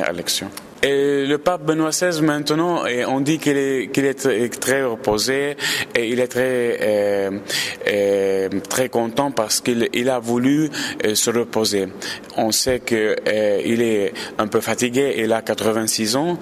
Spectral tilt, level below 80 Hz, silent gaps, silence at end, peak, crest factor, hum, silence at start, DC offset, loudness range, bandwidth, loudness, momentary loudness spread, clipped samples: -3.5 dB/octave; -54 dBFS; none; 0 s; -4 dBFS; 16 dB; none; 0 s; under 0.1%; 1 LU; 16 kHz; -19 LUFS; 4 LU; under 0.1%